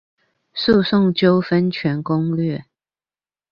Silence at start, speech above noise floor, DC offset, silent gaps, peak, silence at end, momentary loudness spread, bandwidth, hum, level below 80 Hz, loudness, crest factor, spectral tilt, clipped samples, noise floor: 0.55 s; over 73 dB; under 0.1%; none; -4 dBFS; 0.9 s; 9 LU; 5.6 kHz; none; -52 dBFS; -18 LUFS; 16 dB; -8.5 dB/octave; under 0.1%; under -90 dBFS